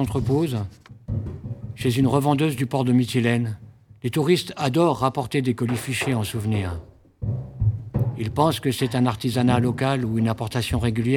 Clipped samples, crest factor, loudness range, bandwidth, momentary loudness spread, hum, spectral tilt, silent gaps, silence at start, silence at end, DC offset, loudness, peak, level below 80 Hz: under 0.1%; 18 dB; 3 LU; 17.5 kHz; 11 LU; none; -6.5 dB/octave; none; 0 s; 0 s; under 0.1%; -23 LUFS; -4 dBFS; -44 dBFS